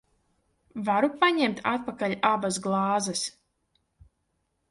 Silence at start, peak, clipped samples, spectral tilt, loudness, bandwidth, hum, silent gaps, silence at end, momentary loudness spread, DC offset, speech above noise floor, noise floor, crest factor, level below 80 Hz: 0.75 s; -8 dBFS; under 0.1%; -4 dB/octave; -26 LUFS; 11.5 kHz; none; none; 1.4 s; 9 LU; under 0.1%; 50 dB; -76 dBFS; 20 dB; -66 dBFS